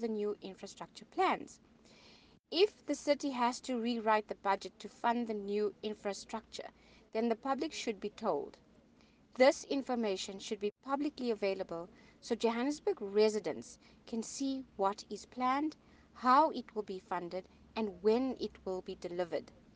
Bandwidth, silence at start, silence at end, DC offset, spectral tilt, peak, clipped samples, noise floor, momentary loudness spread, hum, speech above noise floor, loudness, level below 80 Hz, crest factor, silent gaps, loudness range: 9.8 kHz; 0 s; 0.3 s; under 0.1%; -4 dB/octave; -14 dBFS; under 0.1%; -65 dBFS; 15 LU; none; 30 dB; -36 LUFS; -72 dBFS; 22 dB; none; 4 LU